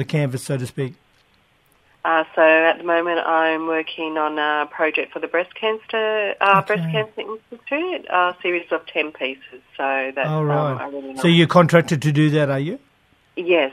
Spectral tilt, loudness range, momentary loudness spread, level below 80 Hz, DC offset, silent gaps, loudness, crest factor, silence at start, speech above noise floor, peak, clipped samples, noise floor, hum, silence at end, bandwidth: -6 dB/octave; 4 LU; 13 LU; -64 dBFS; under 0.1%; none; -20 LUFS; 20 dB; 0 s; 40 dB; 0 dBFS; under 0.1%; -59 dBFS; none; 0 s; 13.5 kHz